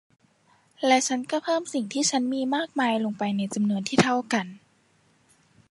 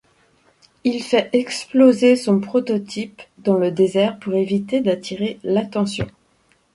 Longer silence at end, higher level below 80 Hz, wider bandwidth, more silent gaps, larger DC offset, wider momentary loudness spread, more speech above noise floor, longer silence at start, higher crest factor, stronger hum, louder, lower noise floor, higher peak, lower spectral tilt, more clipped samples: first, 1.15 s vs 0.65 s; second, -68 dBFS vs -54 dBFS; about the same, 11.5 kHz vs 11.5 kHz; neither; neither; second, 6 LU vs 11 LU; about the same, 39 dB vs 42 dB; about the same, 0.8 s vs 0.85 s; about the same, 22 dB vs 18 dB; neither; second, -25 LUFS vs -19 LUFS; first, -64 dBFS vs -60 dBFS; about the same, -4 dBFS vs -2 dBFS; second, -4 dB/octave vs -6 dB/octave; neither